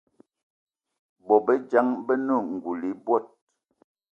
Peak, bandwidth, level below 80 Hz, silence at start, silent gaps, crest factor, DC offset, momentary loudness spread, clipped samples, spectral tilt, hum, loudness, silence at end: -6 dBFS; 7 kHz; -76 dBFS; 1.25 s; none; 22 dB; under 0.1%; 10 LU; under 0.1%; -8.5 dB/octave; none; -25 LUFS; 0.85 s